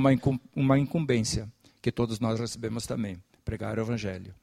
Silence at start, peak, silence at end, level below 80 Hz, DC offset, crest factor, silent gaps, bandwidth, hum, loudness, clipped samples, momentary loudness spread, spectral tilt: 0 s; -10 dBFS; 0.1 s; -50 dBFS; under 0.1%; 18 dB; none; 14.5 kHz; none; -29 LUFS; under 0.1%; 12 LU; -6 dB/octave